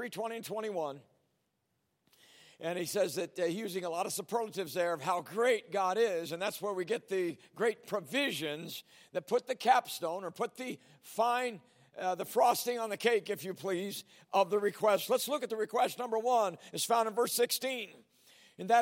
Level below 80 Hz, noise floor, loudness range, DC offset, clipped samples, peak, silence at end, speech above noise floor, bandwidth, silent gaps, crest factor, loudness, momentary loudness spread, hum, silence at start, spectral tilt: -90 dBFS; -80 dBFS; 5 LU; under 0.1%; under 0.1%; -12 dBFS; 0 s; 47 dB; 16.5 kHz; none; 20 dB; -33 LUFS; 12 LU; none; 0 s; -3 dB/octave